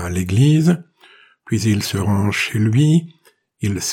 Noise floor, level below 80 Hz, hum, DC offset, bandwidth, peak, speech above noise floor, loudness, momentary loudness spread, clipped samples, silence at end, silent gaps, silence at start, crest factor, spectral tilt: -50 dBFS; -50 dBFS; none; under 0.1%; 16.5 kHz; -4 dBFS; 33 dB; -17 LUFS; 10 LU; under 0.1%; 0 s; none; 0 s; 14 dB; -5.5 dB/octave